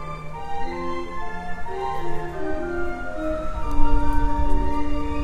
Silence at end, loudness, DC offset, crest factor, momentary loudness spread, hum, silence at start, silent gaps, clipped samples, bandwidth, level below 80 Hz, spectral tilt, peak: 0 s; -28 LUFS; under 0.1%; 16 dB; 8 LU; none; 0 s; none; under 0.1%; 5 kHz; -26 dBFS; -7 dB/octave; -2 dBFS